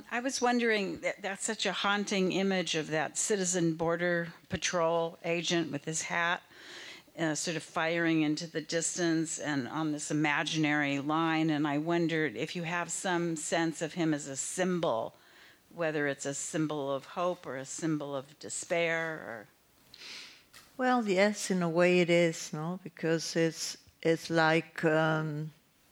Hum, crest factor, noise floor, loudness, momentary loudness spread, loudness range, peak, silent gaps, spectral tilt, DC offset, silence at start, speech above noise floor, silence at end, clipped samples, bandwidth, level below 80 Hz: none; 20 dB; -59 dBFS; -31 LUFS; 11 LU; 5 LU; -12 dBFS; none; -4 dB/octave; under 0.1%; 0 s; 28 dB; 0.4 s; under 0.1%; 16.5 kHz; -70 dBFS